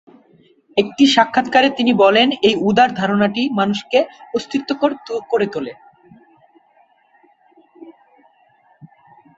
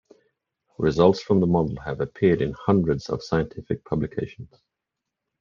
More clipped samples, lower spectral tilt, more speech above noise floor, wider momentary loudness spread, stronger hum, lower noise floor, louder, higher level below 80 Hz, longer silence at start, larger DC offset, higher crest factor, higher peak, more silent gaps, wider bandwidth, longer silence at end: neither; second, -5 dB/octave vs -8 dB/octave; second, 40 dB vs 62 dB; about the same, 10 LU vs 11 LU; neither; second, -56 dBFS vs -84 dBFS; first, -16 LUFS vs -23 LUFS; second, -60 dBFS vs -50 dBFS; about the same, 0.75 s vs 0.8 s; neither; about the same, 18 dB vs 20 dB; about the same, -2 dBFS vs -4 dBFS; neither; first, 8 kHz vs 7.2 kHz; first, 1.45 s vs 0.95 s